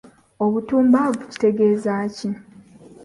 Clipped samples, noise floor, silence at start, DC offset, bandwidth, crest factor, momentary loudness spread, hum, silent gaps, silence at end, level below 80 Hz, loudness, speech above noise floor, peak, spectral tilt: under 0.1%; -45 dBFS; 0.4 s; under 0.1%; 11.5 kHz; 16 dB; 12 LU; none; none; 0.7 s; -60 dBFS; -20 LUFS; 26 dB; -4 dBFS; -7 dB/octave